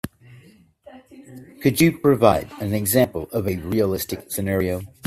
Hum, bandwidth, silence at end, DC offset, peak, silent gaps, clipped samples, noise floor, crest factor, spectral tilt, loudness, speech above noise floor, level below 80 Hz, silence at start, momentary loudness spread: none; 16 kHz; 0 s; under 0.1%; 0 dBFS; none; under 0.1%; -51 dBFS; 22 dB; -5.5 dB/octave; -21 LUFS; 30 dB; -50 dBFS; 0.05 s; 10 LU